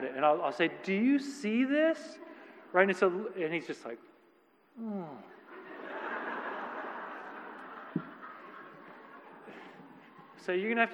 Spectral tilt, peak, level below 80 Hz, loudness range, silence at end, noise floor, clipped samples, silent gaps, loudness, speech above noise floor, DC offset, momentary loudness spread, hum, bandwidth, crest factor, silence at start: -6 dB/octave; -10 dBFS; -90 dBFS; 14 LU; 0 s; -66 dBFS; under 0.1%; none; -32 LUFS; 35 dB; under 0.1%; 23 LU; none; 10.5 kHz; 24 dB; 0 s